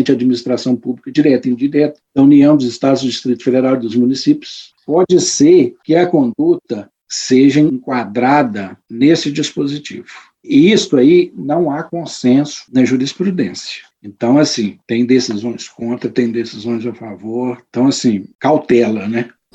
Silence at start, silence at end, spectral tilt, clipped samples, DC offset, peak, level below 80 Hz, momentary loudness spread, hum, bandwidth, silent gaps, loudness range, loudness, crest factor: 0 s; 0.25 s; -5.5 dB/octave; under 0.1%; under 0.1%; 0 dBFS; -58 dBFS; 13 LU; none; 8.4 kHz; 18.35-18.39 s; 4 LU; -14 LUFS; 14 dB